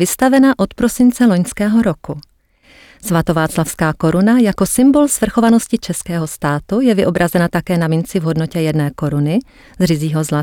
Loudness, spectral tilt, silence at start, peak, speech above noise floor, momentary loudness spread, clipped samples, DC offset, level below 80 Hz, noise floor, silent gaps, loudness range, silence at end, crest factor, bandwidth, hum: -15 LUFS; -6 dB/octave; 0 s; -2 dBFS; 34 dB; 8 LU; under 0.1%; under 0.1%; -40 dBFS; -48 dBFS; none; 3 LU; 0 s; 12 dB; 18.5 kHz; none